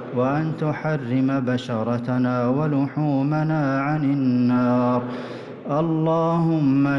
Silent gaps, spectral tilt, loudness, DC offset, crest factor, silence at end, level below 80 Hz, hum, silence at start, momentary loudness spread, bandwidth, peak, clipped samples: none; -9 dB/octave; -22 LUFS; under 0.1%; 10 dB; 0 s; -60 dBFS; none; 0 s; 6 LU; 7 kHz; -12 dBFS; under 0.1%